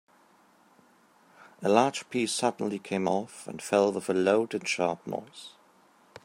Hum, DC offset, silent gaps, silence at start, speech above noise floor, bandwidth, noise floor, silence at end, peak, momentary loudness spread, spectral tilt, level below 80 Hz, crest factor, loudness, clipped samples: none; under 0.1%; none; 1.6 s; 34 dB; 16 kHz; -62 dBFS; 0.05 s; -8 dBFS; 15 LU; -4.5 dB/octave; -78 dBFS; 22 dB; -28 LUFS; under 0.1%